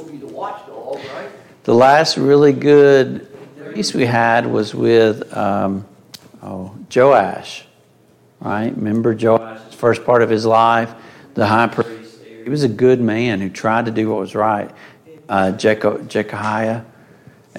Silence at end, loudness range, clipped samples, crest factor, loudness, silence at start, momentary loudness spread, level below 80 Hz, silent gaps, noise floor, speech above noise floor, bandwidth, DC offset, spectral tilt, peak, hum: 0 s; 5 LU; under 0.1%; 16 dB; -15 LUFS; 0 s; 19 LU; -60 dBFS; none; -52 dBFS; 37 dB; 13 kHz; under 0.1%; -6 dB/octave; 0 dBFS; none